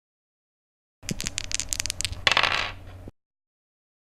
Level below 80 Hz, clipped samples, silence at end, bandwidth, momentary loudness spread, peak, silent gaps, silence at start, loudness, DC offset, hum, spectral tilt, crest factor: -44 dBFS; under 0.1%; 0.9 s; 16 kHz; 18 LU; 0 dBFS; none; 1.05 s; -25 LUFS; under 0.1%; none; -1 dB/octave; 30 dB